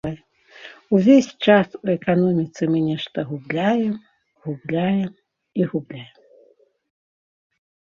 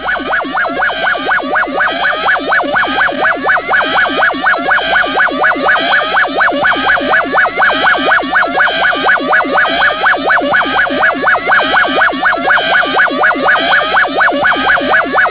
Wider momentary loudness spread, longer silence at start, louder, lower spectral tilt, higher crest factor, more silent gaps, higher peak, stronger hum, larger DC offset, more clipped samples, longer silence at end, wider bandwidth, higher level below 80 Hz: first, 19 LU vs 3 LU; about the same, 0.05 s vs 0 s; second, -20 LUFS vs -10 LUFS; about the same, -7 dB/octave vs -6.5 dB/octave; first, 20 dB vs 10 dB; neither; about the same, -2 dBFS vs 0 dBFS; neither; second, under 0.1% vs 0.4%; neither; first, 1.85 s vs 0 s; first, 7.4 kHz vs 4 kHz; second, -60 dBFS vs -44 dBFS